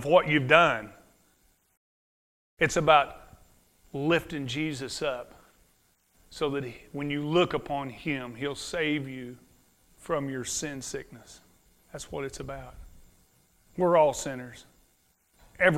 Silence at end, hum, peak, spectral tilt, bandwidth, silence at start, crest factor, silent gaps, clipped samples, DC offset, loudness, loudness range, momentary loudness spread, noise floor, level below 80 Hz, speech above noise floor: 0 s; none; -4 dBFS; -4.5 dB/octave; 16 kHz; 0 s; 26 dB; 1.77-2.57 s; under 0.1%; under 0.1%; -28 LUFS; 8 LU; 22 LU; -68 dBFS; -56 dBFS; 40 dB